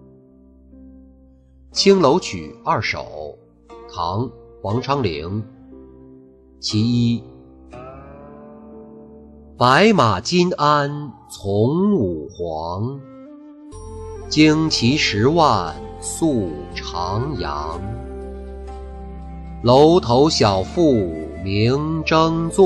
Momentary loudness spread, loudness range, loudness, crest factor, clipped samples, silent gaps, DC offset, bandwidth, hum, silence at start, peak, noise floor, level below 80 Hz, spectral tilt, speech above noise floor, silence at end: 21 LU; 8 LU; -18 LUFS; 18 dB; under 0.1%; none; under 0.1%; 12.5 kHz; none; 0.8 s; -2 dBFS; -49 dBFS; -40 dBFS; -5.5 dB/octave; 31 dB; 0 s